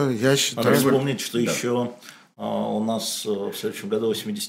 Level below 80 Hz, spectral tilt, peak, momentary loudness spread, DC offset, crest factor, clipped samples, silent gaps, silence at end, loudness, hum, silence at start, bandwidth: -68 dBFS; -4.5 dB/octave; -4 dBFS; 10 LU; under 0.1%; 18 dB; under 0.1%; none; 0 s; -23 LUFS; none; 0 s; 16 kHz